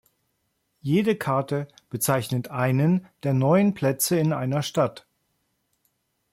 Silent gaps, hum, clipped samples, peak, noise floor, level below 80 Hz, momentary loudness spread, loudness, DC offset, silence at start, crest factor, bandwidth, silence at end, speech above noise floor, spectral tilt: none; none; under 0.1%; -8 dBFS; -74 dBFS; -64 dBFS; 8 LU; -24 LUFS; under 0.1%; 0.85 s; 16 dB; 16.5 kHz; 1.35 s; 51 dB; -6 dB/octave